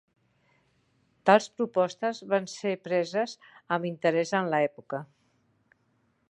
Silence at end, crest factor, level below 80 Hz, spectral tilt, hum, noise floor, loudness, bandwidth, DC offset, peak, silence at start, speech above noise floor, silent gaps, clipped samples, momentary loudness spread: 1.25 s; 24 dB; -80 dBFS; -5 dB/octave; none; -71 dBFS; -28 LUFS; 11 kHz; under 0.1%; -6 dBFS; 1.25 s; 43 dB; none; under 0.1%; 12 LU